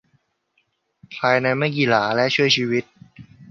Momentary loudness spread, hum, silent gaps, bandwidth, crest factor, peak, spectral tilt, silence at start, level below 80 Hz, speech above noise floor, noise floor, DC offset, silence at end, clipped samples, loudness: 7 LU; none; none; 7.2 kHz; 20 dB; -2 dBFS; -5 dB/octave; 1.1 s; -64 dBFS; 49 dB; -69 dBFS; under 0.1%; 0.05 s; under 0.1%; -19 LUFS